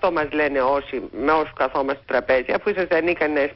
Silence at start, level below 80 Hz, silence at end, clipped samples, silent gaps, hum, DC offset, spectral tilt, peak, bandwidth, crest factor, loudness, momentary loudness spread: 0 s; -48 dBFS; 0 s; under 0.1%; none; none; under 0.1%; -9.5 dB/octave; -6 dBFS; 5.8 kHz; 14 dB; -21 LUFS; 5 LU